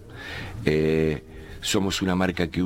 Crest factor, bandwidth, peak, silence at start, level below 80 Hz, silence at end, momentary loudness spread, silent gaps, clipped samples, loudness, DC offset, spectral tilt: 20 dB; 17 kHz; -4 dBFS; 0 s; -42 dBFS; 0 s; 13 LU; none; under 0.1%; -25 LUFS; under 0.1%; -5 dB/octave